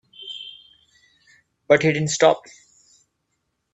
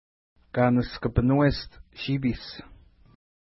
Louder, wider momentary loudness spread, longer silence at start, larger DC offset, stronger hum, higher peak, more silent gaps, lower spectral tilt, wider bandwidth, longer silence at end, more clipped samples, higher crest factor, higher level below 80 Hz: first, -19 LUFS vs -26 LUFS; about the same, 18 LU vs 17 LU; second, 0.2 s vs 0.55 s; neither; neither; first, -2 dBFS vs -10 dBFS; neither; second, -4 dB/octave vs -11 dB/octave; first, 8.4 kHz vs 5.8 kHz; first, 1.35 s vs 0.95 s; neither; about the same, 22 dB vs 18 dB; second, -64 dBFS vs -42 dBFS